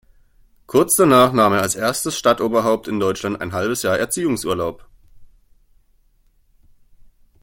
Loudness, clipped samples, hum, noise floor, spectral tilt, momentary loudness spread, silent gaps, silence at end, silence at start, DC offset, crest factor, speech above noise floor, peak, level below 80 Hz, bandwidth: -18 LUFS; under 0.1%; none; -57 dBFS; -4 dB/octave; 10 LU; none; 2.15 s; 0.7 s; under 0.1%; 18 dB; 40 dB; -2 dBFS; -52 dBFS; 17 kHz